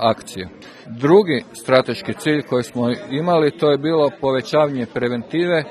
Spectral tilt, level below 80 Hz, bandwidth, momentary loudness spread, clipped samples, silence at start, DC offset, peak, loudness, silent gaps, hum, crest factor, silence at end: -6 dB/octave; -58 dBFS; 13 kHz; 10 LU; under 0.1%; 0 s; under 0.1%; 0 dBFS; -18 LUFS; none; none; 18 dB; 0 s